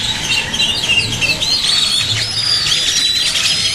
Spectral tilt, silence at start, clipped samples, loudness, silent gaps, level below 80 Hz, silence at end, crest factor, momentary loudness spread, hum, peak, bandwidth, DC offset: -0.5 dB/octave; 0 s; under 0.1%; -12 LUFS; none; -38 dBFS; 0 s; 16 dB; 3 LU; none; 0 dBFS; 16 kHz; under 0.1%